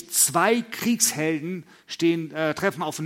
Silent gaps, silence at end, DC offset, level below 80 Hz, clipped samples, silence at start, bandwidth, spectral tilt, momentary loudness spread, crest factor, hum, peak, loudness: none; 0 s; under 0.1%; -68 dBFS; under 0.1%; 0 s; 16.5 kHz; -3 dB/octave; 13 LU; 20 dB; none; -4 dBFS; -23 LUFS